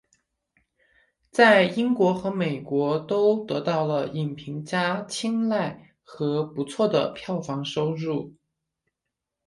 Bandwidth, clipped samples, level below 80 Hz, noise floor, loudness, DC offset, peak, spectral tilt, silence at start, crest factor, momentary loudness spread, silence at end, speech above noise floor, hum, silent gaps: 11.5 kHz; under 0.1%; -66 dBFS; -85 dBFS; -24 LUFS; under 0.1%; -4 dBFS; -6 dB/octave; 1.35 s; 22 dB; 11 LU; 1.15 s; 61 dB; none; none